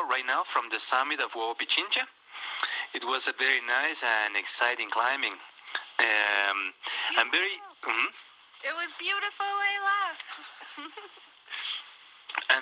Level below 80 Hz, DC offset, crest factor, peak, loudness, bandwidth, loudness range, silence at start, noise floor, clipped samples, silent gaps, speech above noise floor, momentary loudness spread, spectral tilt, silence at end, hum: -84 dBFS; under 0.1%; 24 dB; -6 dBFS; -28 LUFS; 5.4 kHz; 5 LU; 0 s; -51 dBFS; under 0.1%; none; 22 dB; 15 LU; 4.5 dB/octave; 0 s; none